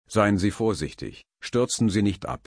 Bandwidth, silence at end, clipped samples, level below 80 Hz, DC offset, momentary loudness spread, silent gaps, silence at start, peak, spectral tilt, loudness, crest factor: 10.5 kHz; 0.1 s; under 0.1%; -48 dBFS; under 0.1%; 16 LU; none; 0.1 s; -6 dBFS; -5.5 dB/octave; -24 LUFS; 18 dB